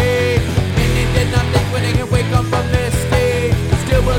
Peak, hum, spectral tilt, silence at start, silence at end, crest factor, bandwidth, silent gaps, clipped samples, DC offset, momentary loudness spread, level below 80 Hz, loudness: -2 dBFS; none; -5.5 dB/octave; 0 s; 0 s; 14 dB; 17 kHz; none; under 0.1%; under 0.1%; 2 LU; -22 dBFS; -16 LUFS